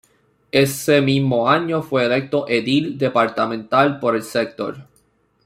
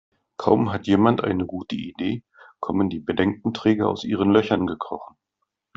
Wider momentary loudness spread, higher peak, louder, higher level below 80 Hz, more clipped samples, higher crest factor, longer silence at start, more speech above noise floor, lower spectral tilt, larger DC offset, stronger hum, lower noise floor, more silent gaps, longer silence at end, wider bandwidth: second, 7 LU vs 13 LU; about the same, -2 dBFS vs -2 dBFS; first, -19 LUFS vs -23 LUFS; about the same, -60 dBFS vs -58 dBFS; neither; about the same, 16 dB vs 20 dB; first, 0.55 s vs 0.4 s; second, 43 dB vs 57 dB; second, -5.5 dB/octave vs -7.5 dB/octave; neither; neither; second, -61 dBFS vs -79 dBFS; neither; about the same, 0.6 s vs 0.7 s; first, 16 kHz vs 7.4 kHz